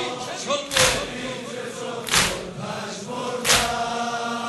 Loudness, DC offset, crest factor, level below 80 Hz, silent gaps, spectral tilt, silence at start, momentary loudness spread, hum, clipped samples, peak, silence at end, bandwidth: -23 LUFS; under 0.1%; 22 dB; -46 dBFS; none; -1.5 dB/octave; 0 s; 12 LU; none; under 0.1%; -2 dBFS; 0 s; 12.5 kHz